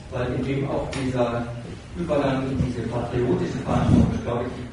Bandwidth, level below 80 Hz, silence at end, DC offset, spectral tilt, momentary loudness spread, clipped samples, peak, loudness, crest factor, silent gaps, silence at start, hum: 10.5 kHz; -38 dBFS; 0 s; under 0.1%; -7.5 dB/octave; 9 LU; under 0.1%; -4 dBFS; -24 LUFS; 20 dB; none; 0 s; none